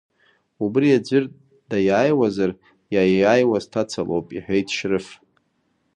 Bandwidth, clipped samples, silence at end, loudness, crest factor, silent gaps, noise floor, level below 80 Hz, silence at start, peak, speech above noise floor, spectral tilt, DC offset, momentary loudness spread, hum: 9.6 kHz; under 0.1%; 0.8 s; -20 LUFS; 18 dB; none; -68 dBFS; -56 dBFS; 0.6 s; -4 dBFS; 49 dB; -6 dB/octave; under 0.1%; 10 LU; none